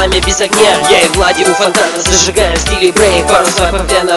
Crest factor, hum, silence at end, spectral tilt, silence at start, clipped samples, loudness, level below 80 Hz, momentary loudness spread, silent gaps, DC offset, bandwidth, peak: 10 dB; none; 0 s; -2.5 dB/octave; 0 s; 0.5%; -9 LUFS; -22 dBFS; 4 LU; none; under 0.1%; 16 kHz; 0 dBFS